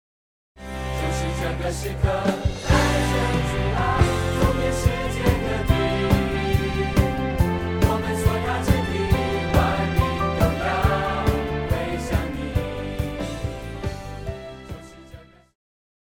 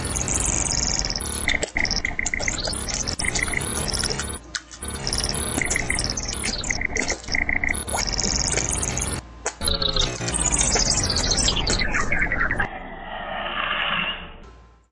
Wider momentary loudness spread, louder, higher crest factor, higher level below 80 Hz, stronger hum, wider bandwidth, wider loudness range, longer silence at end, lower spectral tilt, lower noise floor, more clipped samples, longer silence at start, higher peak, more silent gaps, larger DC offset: about the same, 11 LU vs 9 LU; about the same, -23 LUFS vs -23 LUFS; about the same, 20 dB vs 20 dB; about the same, -30 dBFS vs -32 dBFS; neither; first, 19 kHz vs 11.5 kHz; about the same, 6 LU vs 4 LU; first, 0.8 s vs 0.25 s; first, -6 dB/octave vs -2 dB/octave; about the same, -45 dBFS vs -46 dBFS; neither; first, 0.55 s vs 0 s; first, -2 dBFS vs -6 dBFS; neither; neither